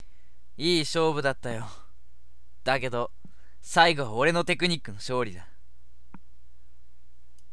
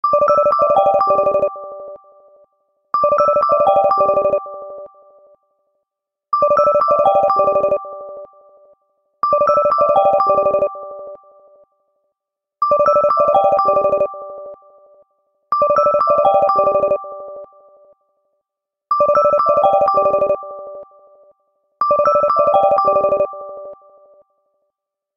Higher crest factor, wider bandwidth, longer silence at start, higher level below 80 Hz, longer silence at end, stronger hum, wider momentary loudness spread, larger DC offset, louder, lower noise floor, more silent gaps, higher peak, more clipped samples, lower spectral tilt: first, 26 dB vs 16 dB; first, 11 kHz vs 6 kHz; first, 0.6 s vs 0.05 s; about the same, -54 dBFS vs -54 dBFS; about the same, 1.35 s vs 1.45 s; neither; second, 14 LU vs 19 LU; first, 2% vs under 0.1%; second, -26 LUFS vs -15 LUFS; second, -59 dBFS vs -81 dBFS; neither; about the same, -4 dBFS vs -2 dBFS; neither; second, -4 dB/octave vs -7 dB/octave